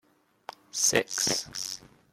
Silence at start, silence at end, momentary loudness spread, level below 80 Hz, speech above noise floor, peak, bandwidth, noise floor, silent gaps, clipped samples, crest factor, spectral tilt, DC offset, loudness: 0.75 s; 0.35 s; 23 LU; -64 dBFS; 20 dB; -6 dBFS; 16.5 kHz; -49 dBFS; none; under 0.1%; 26 dB; -1 dB/octave; under 0.1%; -27 LUFS